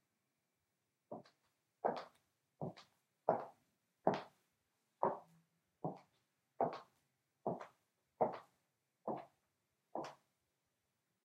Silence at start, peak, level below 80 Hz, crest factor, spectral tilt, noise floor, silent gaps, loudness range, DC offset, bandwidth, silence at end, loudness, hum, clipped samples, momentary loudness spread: 1.1 s; -16 dBFS; -90 dBFS; 32 dB; -7 dB/octave; -87 dBFS; none; 4 LU; under 0.1%; 13.5 kHz; 1.1 s; -44 LUFS; none; under 0.1%; 16 LU